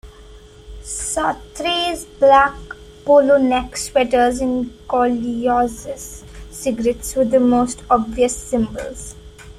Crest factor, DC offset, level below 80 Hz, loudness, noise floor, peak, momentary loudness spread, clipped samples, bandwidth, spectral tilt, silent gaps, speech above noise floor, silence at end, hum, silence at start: 16 dB; under 0.1%; -40 dBFS; -17 LUFS; -41 dBFS; -2 dBFS; 18 LU; under 0.1%; 14.5 kHz; -3.5 dB/octave; none; 24 dB; 0.05 s; none; 0.05 s